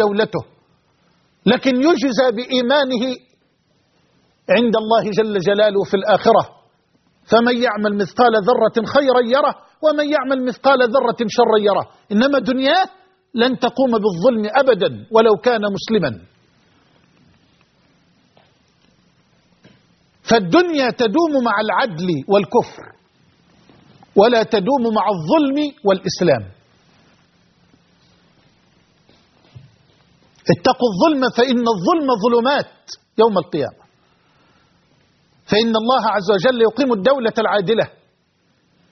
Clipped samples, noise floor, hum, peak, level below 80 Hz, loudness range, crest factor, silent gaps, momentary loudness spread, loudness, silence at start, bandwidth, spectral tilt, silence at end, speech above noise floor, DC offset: under 0.1%; -62 dBFS; none; 0 dBFS; -60 dBFS; 5 LU; 18 dB; none; 7 LU; -16 LUFS; 0 s; 6.4 kHz; -3.5 dB/octave; 1.05 s; 46 dB; under 0.1%